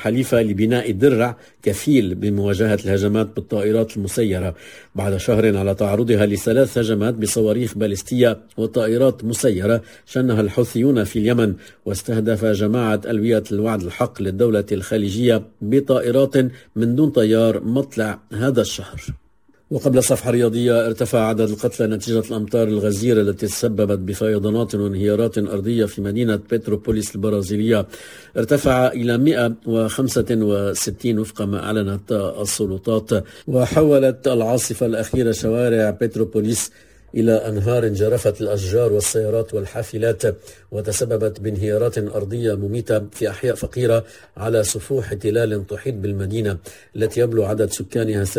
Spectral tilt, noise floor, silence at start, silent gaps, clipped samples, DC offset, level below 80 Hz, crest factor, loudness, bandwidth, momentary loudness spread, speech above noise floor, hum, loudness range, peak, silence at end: -6 dB/octave; -58 dBFS; 0 s; none; under 0.1%; 0.1%; -42 dBFS; 18 dB; -19 LUFS; 16 kHz; 7 LU; 40 dB; none; 3 LU; -2 dBFS; 0 s